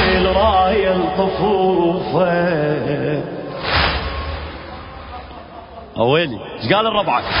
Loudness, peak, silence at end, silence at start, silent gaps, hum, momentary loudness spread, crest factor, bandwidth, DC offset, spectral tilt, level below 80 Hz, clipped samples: -17 LUFS; -2 dBFS; 0 s; 0 s; none; none; 19 LU; 16 dB; 5.4 kHz; under 0.1%; -10.5 dB/octave; -32 dBFS; under 0.1%